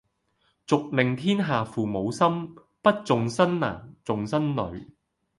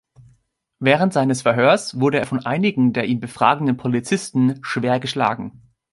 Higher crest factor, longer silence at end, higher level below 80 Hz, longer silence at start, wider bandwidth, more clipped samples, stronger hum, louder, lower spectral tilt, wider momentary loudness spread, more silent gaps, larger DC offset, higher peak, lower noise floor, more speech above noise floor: about the same, 22 dB vs 18 dB; about the same, 0.55 s vs 0.45 s; about the same, -58 dBFS vs -60 dBFS; about the same, 0.7 s vs 0.8 s; about the same, 11.5 kHz vs 11.5 kHz; neither; neither; second, -25 LUFS vs -19 LUFS; about the same, -6.5 dB/octave vs -6 dB/octave; first, 11 LU vs 6 LU; neither; neither; about the same, -4 dBFS vs -2 dBFS; first, -70 dBFS vs -62 dBFS; about the same, 45 dB vs 43 dB